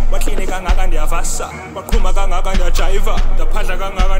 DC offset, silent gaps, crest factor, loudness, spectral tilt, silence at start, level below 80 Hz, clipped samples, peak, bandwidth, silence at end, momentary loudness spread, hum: under 0.1%; none; 10 dB; -20 LUFS; -4 dB/octave; 0 s; -12 dBFS; under 0.1%; 0 dBFS; 12.5 kHz; 0 s; 3 LU; none